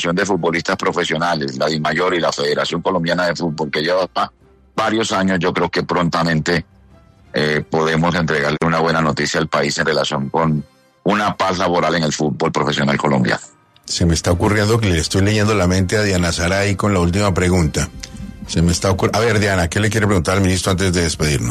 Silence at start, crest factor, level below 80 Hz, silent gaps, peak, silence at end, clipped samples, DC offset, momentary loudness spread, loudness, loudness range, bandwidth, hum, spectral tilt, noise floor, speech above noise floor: 0 s; 16 dB; -36 dBFS; none; -2 dBFS; 0 s; under 0.1%; under 0.1%; 4 LU; -17 LUFS; 2 LU; 13.5 kHz; none; -5 dB/octave; -47 dBFS; 30 dB